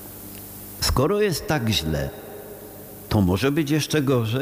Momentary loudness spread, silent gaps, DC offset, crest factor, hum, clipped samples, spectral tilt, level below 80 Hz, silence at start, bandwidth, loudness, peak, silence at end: 18 LU; none; under 0.1%; 14 dB; none; under 0.1%; -5 dB/octave; -38 dBFS; 0 s; 19 kHz; -22 LUFS; -8 dBFS; 0 s